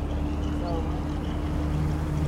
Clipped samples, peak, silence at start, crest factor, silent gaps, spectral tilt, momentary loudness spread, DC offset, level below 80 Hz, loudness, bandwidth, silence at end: under 0.1%; -16 dBFS; 0 s; 12 dB; none; -8 dB/octave; 3 LU; under 0.1%; -32 dBFS; -29 LUFS; 12.5 kHz; 0 s